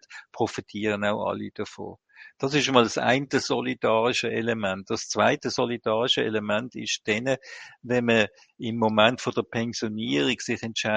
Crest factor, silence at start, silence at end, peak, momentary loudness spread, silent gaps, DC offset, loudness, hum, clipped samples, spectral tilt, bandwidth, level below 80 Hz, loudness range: 24 dB; 0.1 s; 0 s; -2 dBFS; 12 LU; none; under 0.1%; -25 LUFS; none; under 0.1%; -4 dB/octave; 9.4 kHz; -64 dBFS; 2 LU